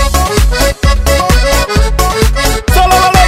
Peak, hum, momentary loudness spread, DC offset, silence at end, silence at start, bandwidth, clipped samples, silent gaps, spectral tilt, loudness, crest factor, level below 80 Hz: 0 dBFS; none; 4 LU; under 0.1%; 0 s; 0 s; 16.5 kHz; 0.4%; none; -4 dB/octave; -10 LUFS; 8 dB; -12 dBFS